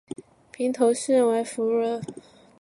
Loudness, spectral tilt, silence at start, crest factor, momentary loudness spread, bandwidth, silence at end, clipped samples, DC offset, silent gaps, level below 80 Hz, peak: -24 LUFS; -4.5 dB/octave; 0.6 s; 18 dB; 19 LU; 11.5 kHz; 0.4 s; under 0.1%; under 0.1%; none; -72 dBFS; -8 dBFS